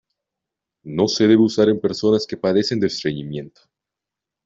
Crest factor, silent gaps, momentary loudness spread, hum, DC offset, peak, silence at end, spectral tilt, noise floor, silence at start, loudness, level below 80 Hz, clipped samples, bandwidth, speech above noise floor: 18 dB; none; 14 LU; none; under 0.1%; -2 dBFS; 1 s; -5.5 dB/octave; -86 dBFS; 0.85 s; -19 LUFS; -58 dBFS; under 0.1%; 7.8 kHz; 67 dB